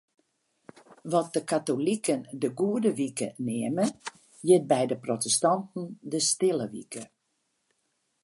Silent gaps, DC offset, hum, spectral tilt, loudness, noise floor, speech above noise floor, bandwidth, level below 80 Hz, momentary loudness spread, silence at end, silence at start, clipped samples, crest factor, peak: none; under 0.1%; none; -4 dB/octave; -27 LUFS; -77 dBFS; 49 dB; 11.5 kHz; -78 dBFS; 15 LU; 1.2 s; 0.9 s; under 0.1%; 20 dB; -8 dBFS